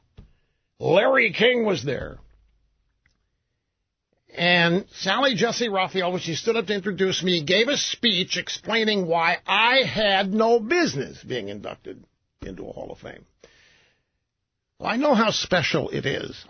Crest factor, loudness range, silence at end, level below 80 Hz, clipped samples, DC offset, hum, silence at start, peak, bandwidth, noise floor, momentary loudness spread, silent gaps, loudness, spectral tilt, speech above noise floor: 20 dB; 11 LU; 0.05 s; -56 dBFS; under 0.1%; under 0.1%; none; 0.2 s; -4 dBFS; 6.6 kHz; -80 dBFS; 19 LU; none; -21 LUFS; -4 dB/octave; 58 dB